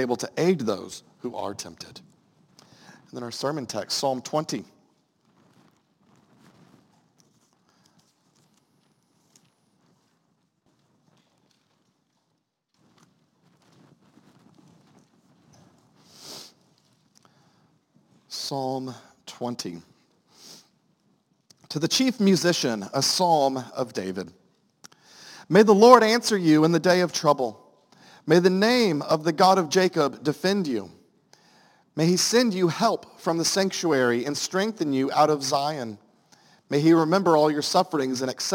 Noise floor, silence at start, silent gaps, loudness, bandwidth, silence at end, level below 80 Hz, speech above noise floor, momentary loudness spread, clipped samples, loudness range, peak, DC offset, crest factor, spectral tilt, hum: -75 dBFS; 0 s; none; -22 LUFS; 17 kHz; 0 s; -74 dBFS; 53 dB; 18 LU; under 0.1%; 16 LU; 0 dBFS; under 0.1%; 26 dB; -4.5 dB/octave; none